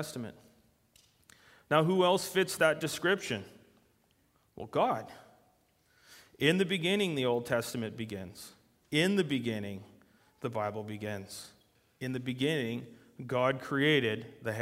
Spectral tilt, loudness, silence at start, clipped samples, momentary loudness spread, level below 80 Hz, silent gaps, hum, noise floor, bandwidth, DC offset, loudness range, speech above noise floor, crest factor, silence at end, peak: -5 dB/octave; -31 LUFS; 0 s; under 0.1%; 19 LU; -70 dBFS; none; none; -71 dBFS; 16 kHz; under 0.1%; 6 LU; 39 dB; 22 dB; 0 s; -10 dBFS